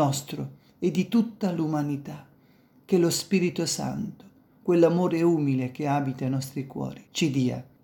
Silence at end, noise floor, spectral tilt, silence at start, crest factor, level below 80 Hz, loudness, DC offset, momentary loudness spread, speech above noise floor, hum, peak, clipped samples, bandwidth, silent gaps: 0.2 s; -59 dBFS; -6 dB/octave; 0 s; 20 dB; -66 dBFS; -26 LUFS; under 0.1%; 13 LU; 33 dB; none; -6 dBFS; under 0.1%; 18 kHz; none